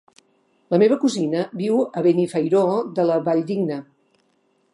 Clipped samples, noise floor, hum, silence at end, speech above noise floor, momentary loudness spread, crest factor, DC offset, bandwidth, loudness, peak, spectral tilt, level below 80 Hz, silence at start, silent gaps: under 0.1%; -65 dBFS; none; 0.9 s; 45 dB; 7 LU; 16 dB; under 0.1%; 11.5 kHz; -20 LUFS; -4 dBFS; -7 dB/octave; -74 dBFS; 0.7 s; none